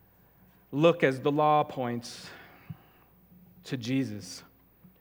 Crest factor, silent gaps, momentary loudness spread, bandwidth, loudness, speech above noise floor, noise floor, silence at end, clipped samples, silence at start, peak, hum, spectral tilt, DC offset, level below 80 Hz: 22 dB; none; 24 LU; 17 kHz; -28 LUFS; 33 dB; -60 dBFS; 0.6 s; under 0.1%; 0.7 s; -8 dBFS; none; -6 dB/octave; under 0.1%; -70 dBFS